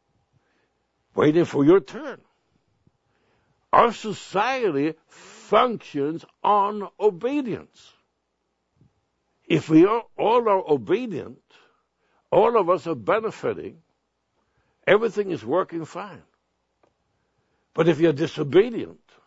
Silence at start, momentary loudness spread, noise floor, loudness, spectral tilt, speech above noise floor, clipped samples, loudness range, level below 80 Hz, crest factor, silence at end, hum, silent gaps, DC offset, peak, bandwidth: 1.15 s; 16 LU; -75 dBFS; -22 LUFS; -6.5 dB/octave; 53 dB; under 0.1%; 4 LU; -64 dBFS; 22 dB; 0.35 s; none; none; under 0.1%; -2 dBFS; 8 kHz